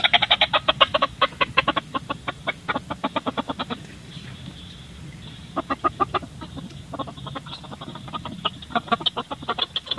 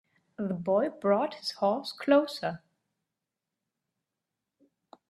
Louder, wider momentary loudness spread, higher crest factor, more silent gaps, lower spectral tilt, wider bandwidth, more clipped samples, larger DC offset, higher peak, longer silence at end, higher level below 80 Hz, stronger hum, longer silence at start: first, -24 LUFS vs -29 LUFS; first, 20 LU vs 11 LU; about the same, 26 dB vs 22 dB; neither; second, -4 dB/octave vs -6 dB/octave; about the same, 12 kHz vs 13 kHz; neither; neither; first, 0 dBFS vs -8 dBFS; second, 0 s vs 2.55 s; first, -50 dBFS vs -76 dBFS; neither; second, 0 s vs 0.4 s